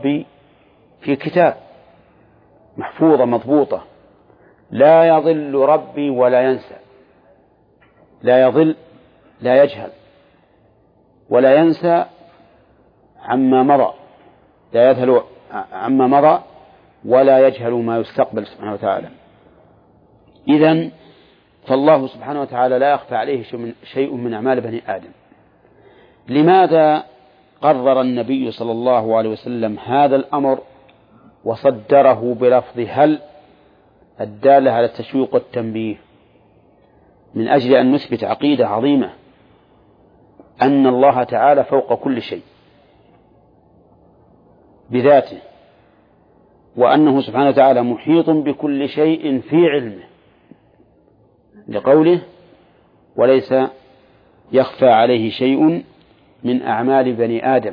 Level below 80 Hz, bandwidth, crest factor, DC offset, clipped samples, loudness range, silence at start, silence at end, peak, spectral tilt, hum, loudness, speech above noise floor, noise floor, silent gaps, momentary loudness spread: -62 dBFS; 5.2 kHz; 16 dB; under 0.1%; under 0.1%; 5 LU; 0 s; 0 s; -2 dBFS; -9.5 dB/octave; none; -15 LUFS; 40 dB; -54 dBFS; none; 14 LU